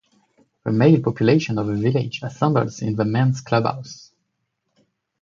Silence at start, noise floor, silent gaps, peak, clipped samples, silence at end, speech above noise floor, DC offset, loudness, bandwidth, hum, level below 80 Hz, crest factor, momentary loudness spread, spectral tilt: 0.65 s; -75 dBFS; none; -2 dBFS; under 0.1%; 1.25 s; 55 dB; under 0.1%; -20 LUFS; 7.4 kHz; none; -56 dBFS; 18 dB; 13 LU; -7.5 dB/octave